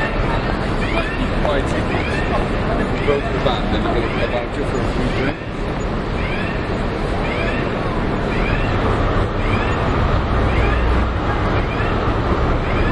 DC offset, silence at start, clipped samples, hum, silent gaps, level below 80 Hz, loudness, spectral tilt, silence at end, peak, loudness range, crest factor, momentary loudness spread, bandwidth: under 0.1%; 0 s; under 0.1%; none; none; -24 dBFS; -20 LUFS; -7 dB/octave; 0 s; -2 dBFS; 3 LU; 16 dB; 3 LU; 11 kHz